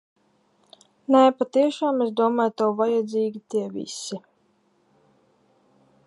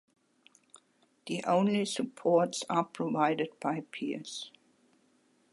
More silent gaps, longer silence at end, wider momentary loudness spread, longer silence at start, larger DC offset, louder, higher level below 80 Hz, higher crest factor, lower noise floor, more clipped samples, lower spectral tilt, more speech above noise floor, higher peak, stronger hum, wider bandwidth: neither; first, 1.85 s vs 1.05 s; about the same, 15 LU vs 13 LU; first, 1.1 s vs 0.75 s; neither; first, -23 LUFS vs -31 LUFS; about the same, -80 dBFS vs -84 dBFS; about the same, 20 dB vs 20 dB; second, -65 dBFS vs -69 dBFS; neither; about the same, -5 dB/octave vs -5 dB/octave; first, 43 dB vs 38 dB; first, -4 dBFS vs -14 dBFS; neither; about the same, 11.5 kHz vs 11.5 kHz